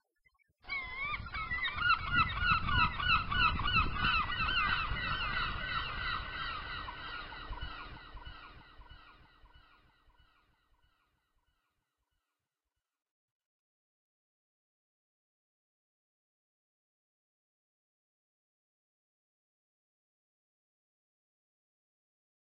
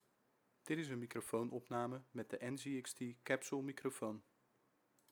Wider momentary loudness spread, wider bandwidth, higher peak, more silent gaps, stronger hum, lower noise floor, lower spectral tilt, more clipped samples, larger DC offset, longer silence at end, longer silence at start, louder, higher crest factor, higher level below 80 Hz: first, 16 LU vs 7 LU; second, 5.6 kHz vs over 20 kHz; first, -16 dBFS vs -22 dBFS; neither; neither; first, under -90 dBFS vs -79 dBFS; second, -1 dB/octave vs -5 dB/octave; neither; neither; first, 12.95 s vs 0.9 s; about the same, 0.65 s vs 0.65 s; first, -33 LUFS vs -45 LUFS; about the same, 22 dB vs 24 dB; first, -48 dBFS vs -88 dBFS